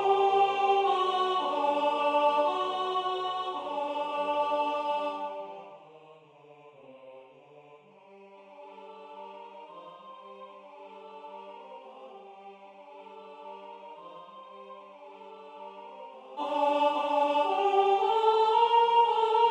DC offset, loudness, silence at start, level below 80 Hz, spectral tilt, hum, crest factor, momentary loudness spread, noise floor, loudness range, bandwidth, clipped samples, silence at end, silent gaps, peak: under 0.1%; -27 LUFS; 0 s; under -90 dBFS; -3.5 dB/octave; none; 18 dB; 24 LU; -55 dBFS; 22 LU; 9.6 kHz; under 0.1%; 0 s; none; -12 dBFS